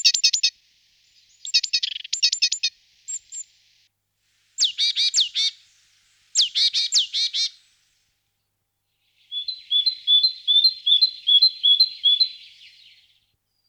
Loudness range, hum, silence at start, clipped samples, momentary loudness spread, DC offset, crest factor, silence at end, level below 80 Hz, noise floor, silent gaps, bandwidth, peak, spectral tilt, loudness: 7 LU; 50 Hz at -80 dBFS; 0.05 s; under 0.1%; 15 LU; under 0.1%; 18 dB; 1.3 s; -80 dBFS; -76 dBFS; none; 18 kHz; -6 dBFS; 8 dB/octave; -18 LUFS